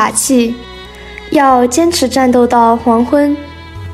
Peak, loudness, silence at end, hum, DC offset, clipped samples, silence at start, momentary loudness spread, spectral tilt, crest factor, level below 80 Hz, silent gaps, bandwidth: 0 dBFS; -11 LUFS; 0 s; none; under 0.1%; under 0.1%; 0 s; 20 LU; -3.5 dB/octave; 10 dB; -38 dBFS; none; 16 kHz